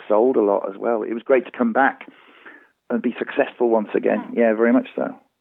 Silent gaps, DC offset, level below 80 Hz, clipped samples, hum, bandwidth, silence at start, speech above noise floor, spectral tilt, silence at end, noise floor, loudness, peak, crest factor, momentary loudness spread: none; under 0.1%; -80 dBFS; under 0.1%; none; 3.9 kHz; 0 s; 27 dB; -9.5 dB/octave; 0.25 s; -47 dBFS; -20 LUFS; -4 dBFS; 18 dB; 9 LU